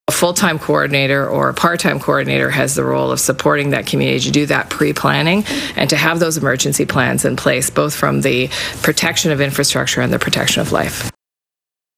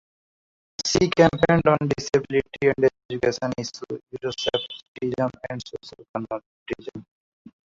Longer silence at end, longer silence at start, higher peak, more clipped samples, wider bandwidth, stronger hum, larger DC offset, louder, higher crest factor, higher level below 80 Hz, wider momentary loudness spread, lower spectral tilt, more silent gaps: first, 0.85 s vs 0.7 s; second, 0.1 s vs 0.8 s; about the same, 0 dBFS vs -2 dBFS; neither; first, 16.5 kHz vs 7.8 kHz; neither; neither; first, -15 LUFS vs -24 LUFS; second, 16 dB vs 22 dB; first, -46 dBFS vs -52 dBFS; second, 3 LU vs 17 LU; about the same, -4 dB/octave vs -5 dB/octave; second, none vs 3.05-3.09 s, 4.88-4.95 s, 6.09-6.14 s, 6.46-6.66 s